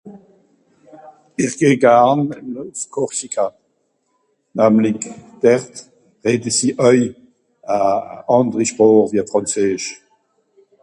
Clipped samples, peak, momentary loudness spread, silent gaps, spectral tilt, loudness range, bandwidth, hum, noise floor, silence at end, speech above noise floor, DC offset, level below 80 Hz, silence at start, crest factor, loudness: under 0.1%; 0 dBFS; 16 LU; none; -5 dB/octave; 3 LU; 11.5 kHz; none; -66 dBFS; 0.9 s; 50 dB; under 0.1%; -60 dBFS; 0.05 s; 18 dB; -17 LUFS